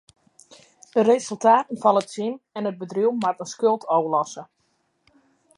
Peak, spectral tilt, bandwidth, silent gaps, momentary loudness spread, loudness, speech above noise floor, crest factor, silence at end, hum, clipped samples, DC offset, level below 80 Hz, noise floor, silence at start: -4 dBFS; -5 dB/octave; 11.5 kHz; none; 11 LU; -22 LUFS; 48 dB; 20 dB; 1.15 s; none; under 0.1%; under 0.1%; -76 dBFS; -69 dBFS; 0.95 s